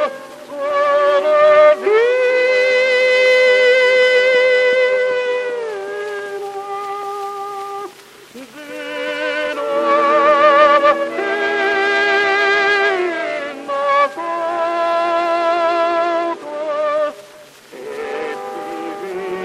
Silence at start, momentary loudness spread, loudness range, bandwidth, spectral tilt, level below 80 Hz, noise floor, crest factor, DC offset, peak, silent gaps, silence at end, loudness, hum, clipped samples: 0 s; 15 LU; 12 LU; 12.5 kHz; -2.5 dB/octave; -64 dBFS; -41 dBFS; 16 dB; under 0.1%; 0 dBFS; none; 0 s; -15 LUFS; none; under 0.1%